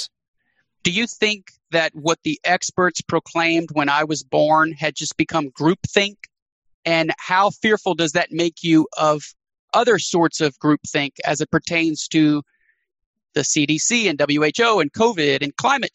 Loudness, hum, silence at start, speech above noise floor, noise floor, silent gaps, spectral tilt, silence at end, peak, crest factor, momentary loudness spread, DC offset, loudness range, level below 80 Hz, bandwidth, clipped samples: -19 LUFS; none; 0 s; 50 dB; -69 dBFS; 0.28-0.34 s, 6.42-6.46 s, 6.52-6.62 s, 6.74-6.83 s, 9.59-9.68 s, 13.06-13.14 s; -3.5 dB/octave; 0.05 s; 0 dBFS; 20 dB; 6 LU; under 0.1%; 2 LU; -60 dBFS; 8.8 kHz; under 0.1%